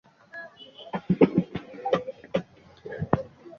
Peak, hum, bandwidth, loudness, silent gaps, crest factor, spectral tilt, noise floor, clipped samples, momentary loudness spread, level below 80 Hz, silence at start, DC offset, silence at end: -4 dBFS; none; 6.8 kHz; -28 LUFS; none; 26 dB; -8.5 dB/octave; -46 dBFS; under 0.1%; 22 LU; -54 dBFS; 0.35 s; under 0.1%; 0.1 s